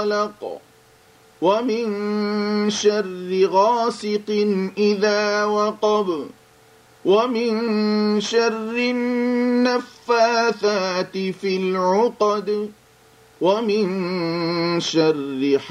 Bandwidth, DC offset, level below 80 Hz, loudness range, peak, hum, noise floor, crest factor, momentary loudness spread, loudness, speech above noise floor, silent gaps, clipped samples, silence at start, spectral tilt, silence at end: 11.5 kHz; under 0.1%; -68 dBFS; 2 LU; -4 dBFS; none; -52 dBFS; 16 dB; 7 LU; -20 LUFS; 32 dB; none; under 0.1%; 0 s; -5 dB/octave; 0 s